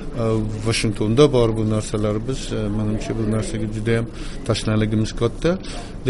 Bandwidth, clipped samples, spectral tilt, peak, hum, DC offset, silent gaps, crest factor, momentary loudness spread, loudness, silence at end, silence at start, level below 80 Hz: 11.5 kHz; under 0.1%; -6 dB/octave; 0 dBFS; none; under 0.1%; none; 20 dB; 9 LU; -21 LUFS; 0 s; 0 s; -32 dBFS